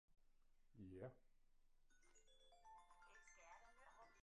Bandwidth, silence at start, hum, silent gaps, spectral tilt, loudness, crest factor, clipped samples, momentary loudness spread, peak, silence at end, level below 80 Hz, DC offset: 10 kHz; 0.1 s; none; none; -5.5 dB/octave; -65 LUFS; 22 dB; under 0.1%; 10 LU; -44 dBFS; 0 s; -78 dBFS; under 0.1%